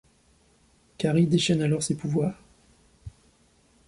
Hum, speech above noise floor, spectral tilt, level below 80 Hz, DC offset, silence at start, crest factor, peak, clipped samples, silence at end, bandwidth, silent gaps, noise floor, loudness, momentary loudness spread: none; 38 dB; -5.5 dB/octave; -56 dBFS; under 0.1%; 1 s; 18 dB; -10 dBFS; under 0.1%; 0.8 s; 11.5 kHz; none; -62 dBFS; -25 LUFS; 26 LU